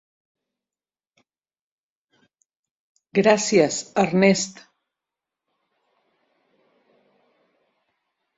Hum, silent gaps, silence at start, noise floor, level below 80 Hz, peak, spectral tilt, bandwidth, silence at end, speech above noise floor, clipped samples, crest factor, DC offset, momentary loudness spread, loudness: none; none; 3.15 s; under -90 dBFS; -66 dBFS; -2 dBFS; -4.5 dB/octave; 8 kHz; 3.85 s; over 71 dB; under 0.1%; 24 dB; under 0.1%; 7 LU; -20 LUFS